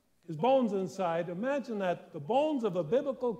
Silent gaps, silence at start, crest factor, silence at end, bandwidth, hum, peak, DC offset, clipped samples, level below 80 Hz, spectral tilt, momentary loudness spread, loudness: none; 0.3 s; 14 dB; 0 s; 9.6 kHz; none; -16 dBFS; under 0.1%; under 0.1%; -78 dBFS; -7 dB/octave; 6 LU; -31 LUFS